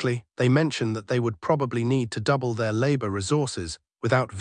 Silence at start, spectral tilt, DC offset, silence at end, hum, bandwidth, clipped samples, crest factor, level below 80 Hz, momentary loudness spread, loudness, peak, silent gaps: 0 s; -6 dB/octave; under 0.1%; 0 s; none; 10 kHz; under 0.1%; 16 dB; -58 dBFS; 6 LU; -25 LUFS; -8 dBFS; none